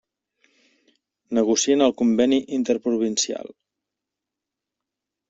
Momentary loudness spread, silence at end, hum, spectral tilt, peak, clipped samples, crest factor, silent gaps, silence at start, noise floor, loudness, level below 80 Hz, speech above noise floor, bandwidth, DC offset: 8 LU; 1.85 s; none; -3.5 dB/octave; -6 dBFS; under 0.1%; 18 dB; none; 1.3 s; -86 dBFS; -21 LUFS; -66 dBFS; 65 dB; 8 kHz; under 0.1%